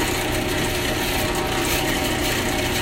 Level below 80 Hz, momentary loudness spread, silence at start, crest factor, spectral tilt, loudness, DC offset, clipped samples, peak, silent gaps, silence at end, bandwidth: -34 dBFS; 1 LU; 0 s; 14 dB; -3.5 dB/octave; -21 LUFS; under 0.1%; under 0.1%; -8 dBFS; none; 0 s; 16.5 kHz